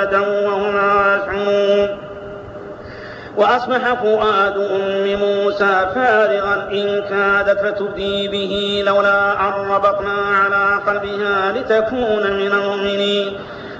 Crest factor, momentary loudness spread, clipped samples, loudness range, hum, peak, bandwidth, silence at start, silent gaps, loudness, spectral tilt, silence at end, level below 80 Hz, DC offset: 12 dB; 10 LU; under 0.1%; 2 LU; none; -4 dBFS; 7.8 kHz; 0 s; none; -16 LUFS; -2 dB/octave; 0 s; -48 dBFS; under 0.1%